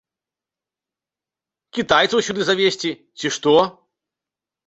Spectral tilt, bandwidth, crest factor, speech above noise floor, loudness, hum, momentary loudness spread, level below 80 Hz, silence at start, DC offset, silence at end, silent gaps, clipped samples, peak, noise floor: -3.5 dB/octave; 8.2 kHz; 20 dB; 71 dB; -19 LUFS; none; 11 LU; -58 dBFS; 1.75 s; under 0.1%; 0.95 s; none; under 0.1%; -2 dBFS; -89 dBFS